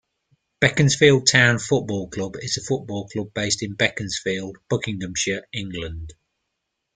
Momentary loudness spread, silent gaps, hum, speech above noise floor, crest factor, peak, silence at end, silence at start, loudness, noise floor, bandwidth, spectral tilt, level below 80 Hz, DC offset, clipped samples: 15 LU; none; none; 57 dB; 22 dB; 0 dBFS; 0.85 s; 0.6 s; -21 LUFS; -79 dBFS; 9.6 kHz; -4 dB/octave; -50 dBFS; under 0.1%; under 0.1%